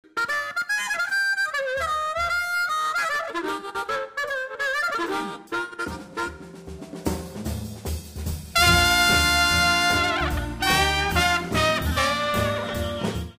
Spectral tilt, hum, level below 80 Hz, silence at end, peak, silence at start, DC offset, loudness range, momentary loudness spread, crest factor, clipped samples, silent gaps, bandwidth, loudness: -3 dB/octave; none; -38 dBFS; 0.05 s; -2 dBFS; 0.15 s; under 0.1%; 10 LU; 14 LU; 22 dB; under 0.1%; none; 16 kHz; -23 LUFS